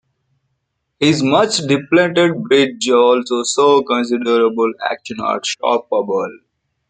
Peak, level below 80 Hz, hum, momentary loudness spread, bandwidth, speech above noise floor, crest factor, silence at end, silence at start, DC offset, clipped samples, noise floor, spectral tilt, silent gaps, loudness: -2 dBFS; -60 dBFS; none; 8 LU; 9.6 kHz; 56 dB; 14 dB; 0.55 s; 1 s; under 0.1%; under 0.1%; -71 dBFS; -4 dB/octave; none; -15 LUFS